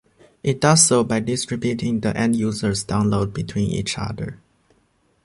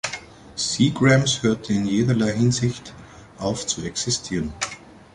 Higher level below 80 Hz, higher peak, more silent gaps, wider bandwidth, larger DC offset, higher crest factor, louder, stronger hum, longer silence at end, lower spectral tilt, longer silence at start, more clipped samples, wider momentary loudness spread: about the same, -46 dBFS vs -48 dBFS; about the same, -2 dBFS vs -4 dBFS; neither; about the same, 11.5 kHz vs 11.5 kHz; neither; about the same, 20 dB vs 18 dB; about the same, -20 LUFS vs -22 LUFS; neither; first, 0.9 s vs 0.15 s; about the same, -4.5 dB/octave vs -4.5 dB/octave; first, 0.45 s vs 0.05 s; neither; second, 13 LU vs 16 LU